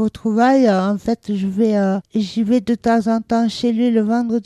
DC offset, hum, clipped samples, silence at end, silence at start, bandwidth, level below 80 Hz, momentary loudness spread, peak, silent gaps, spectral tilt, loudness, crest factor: under 0.1%; none; under 0.1%; 0.05 s; 0 s; 11 kHz; -52 dBFS; 7 LU; -4 dBFS; none; -7 dB/octave; -17 LUFS; 12 dB